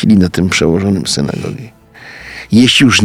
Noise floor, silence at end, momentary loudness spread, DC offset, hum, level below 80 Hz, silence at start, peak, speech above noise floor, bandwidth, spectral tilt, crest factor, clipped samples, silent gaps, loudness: -34 dBFS; 0 s; 21 LU; under 0.1%; none; -38 dBFS; 0 s; 0 dBFS; 24 dB; 15.5 kHz; -4.5 dB/octave; 12 dB; under 0.1%; none; -11 LUFS